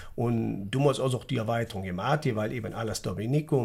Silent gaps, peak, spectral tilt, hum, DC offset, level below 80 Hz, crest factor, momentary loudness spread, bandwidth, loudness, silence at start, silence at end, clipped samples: none; -12 dBFS; -6.5 dB/octave; none; under 0.1%; -52 dBFS; 16 dB; 7 LU; 16 kHz; -29 LUFS; 0 s; 0 s; under 0.1%